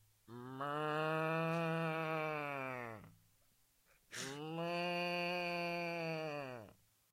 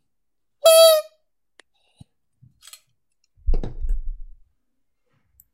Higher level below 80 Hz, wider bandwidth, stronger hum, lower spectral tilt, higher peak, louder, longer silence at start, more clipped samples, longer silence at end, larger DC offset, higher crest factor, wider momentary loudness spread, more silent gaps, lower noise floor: second, -82 dBFS vs -30 dBFS; about the same, 16 kHz vs 16 kHz; neither; first, -5.5 dB/octave vs -2 dB/octave; second, -26 dBFS vs -2 dBFS; second, -40 LUFS vs -16 LUFS; second, 0.3 s vs 0.65 s; neither; second, 0.4 s vs 1.3 s; neither; about the same, 16 dB vs 20 dB; second, 14 LU vs 22 LU; neither; second, -74 dBFS vs -83 dBFS